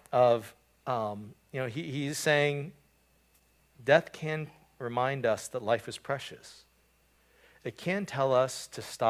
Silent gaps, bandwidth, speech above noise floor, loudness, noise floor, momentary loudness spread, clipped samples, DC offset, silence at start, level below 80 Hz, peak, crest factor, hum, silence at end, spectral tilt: none; 16 kHz; 37 dB; -31 LUFS; -67 dBFS; 18 LU; under 0.1%; under 0.1%; 0.1 s; -70 dBFS; -8 dBFS; 24 dB; none; 0 s; -4.5 dB/octave